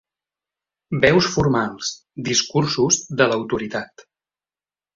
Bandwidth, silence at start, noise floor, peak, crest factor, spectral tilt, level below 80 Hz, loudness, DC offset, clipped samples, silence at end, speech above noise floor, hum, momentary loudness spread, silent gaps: 7.6 kHz; 0.9 s; under -90 dBFS; -2 dBFS; 20 dB; -4 dB/octave; -48 dBFS; -20 LUFS; under 0.1%; under 0.1%; 1.1 s; over 70 dB; 50 Hz at -45 dBFS; 13 LU; none